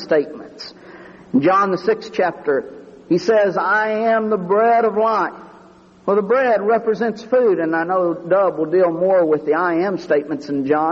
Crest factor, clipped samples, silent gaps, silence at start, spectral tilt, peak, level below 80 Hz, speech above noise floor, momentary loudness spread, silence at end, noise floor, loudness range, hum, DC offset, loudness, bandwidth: 14 dB; under 0.1%; none; 0 s; -7 dB/octave; -4 dBFS; -62 dBFS; 29 dB; 7 LU; 0 s; -46 dBFS; 2 LU; none; under 0.1%; -18 LUFS; 7.2 kHz